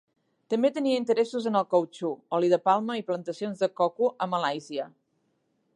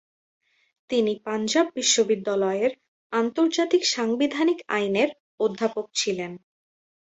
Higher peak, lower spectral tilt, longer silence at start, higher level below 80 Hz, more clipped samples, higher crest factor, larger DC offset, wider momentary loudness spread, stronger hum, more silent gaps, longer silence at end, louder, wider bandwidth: second, -10 dBFS vs -6 dBFS; first, -6 dB/octave vs -3 dB/octave; second, 0.5 s vs 0.9 s; second, -82 dBFS vs -72 dBFS; neither; about the same, 18 dB vs 18 dB; neither; first, 10 LU vs 7 LU; neither; second, none vs 2.88-3.10 s, 5.20-5.38 s; first, 0.85 s vs 0.65 s; second, -27 LUFS vs -24 LUFS; first, 11 kHz vs 8.2 kHz